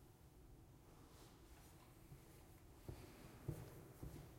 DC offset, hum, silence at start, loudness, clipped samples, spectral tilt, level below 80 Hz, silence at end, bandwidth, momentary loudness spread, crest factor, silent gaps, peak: under 0.1%; none; 0 s; -60 LUFS; under 0.1%; -6 dB/octave; -66 dBFS; 0 s; 16.5 kHz; 12 LU; 26 dB; none; -34 dBFS